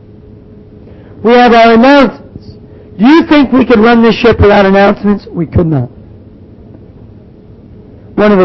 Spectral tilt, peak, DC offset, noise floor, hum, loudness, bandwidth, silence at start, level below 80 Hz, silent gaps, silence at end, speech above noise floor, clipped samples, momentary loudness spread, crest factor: -7.5 dB/octave; 0 dBFS; under 0.1%; -34 dBFS; none; -7 LUFS; 6.2 kHz; 1.2 s; -30 dBFS; none; 0 s; 29 dB; 0.5%; 10 LU; 8 dB